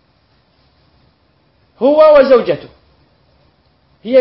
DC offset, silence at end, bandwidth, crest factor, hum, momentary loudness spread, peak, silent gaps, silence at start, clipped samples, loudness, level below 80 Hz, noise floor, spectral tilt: under 0.1%; 0 s; 5.8 kHz; 14 dB; none; 15 LU; 0 dBFS; none; 1.8 s; under 0.1%; -10 LUFS; -52 dBFS; -56 dBFS; -8.5 dB/octave